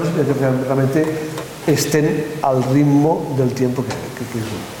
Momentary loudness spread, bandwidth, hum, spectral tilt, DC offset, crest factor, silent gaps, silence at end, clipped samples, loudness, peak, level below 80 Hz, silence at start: 11 LU; 18.5 kHz; none; -6.5 dB/octave; under 0.1%; 14 dB; none; 0 s; under 0.1%; -18 LUFS; -4 dBFS; -52 dBFS; 0 s